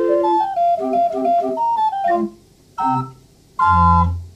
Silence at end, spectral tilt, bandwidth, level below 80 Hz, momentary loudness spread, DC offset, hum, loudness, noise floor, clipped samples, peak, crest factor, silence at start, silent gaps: 0.05 s; -8.5 dB/octave; 9.8 kHz; -36 dBFS; 11 LU; under 0.1%; none; -17 LUFS; -46 dBFS; under 0.1%; -4 dBFS; 14 dB; 0 s; none